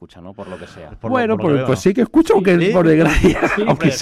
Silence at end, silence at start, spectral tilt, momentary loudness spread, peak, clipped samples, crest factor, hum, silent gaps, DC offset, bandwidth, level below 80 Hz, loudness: 0 s; 0 s; -6.5 dB/octave; 20 LU; -4 dBFS; under 0.1%; 12 dB; none; none; under 0.1%; 14 kHz; -32 dBFS; -15 LUFS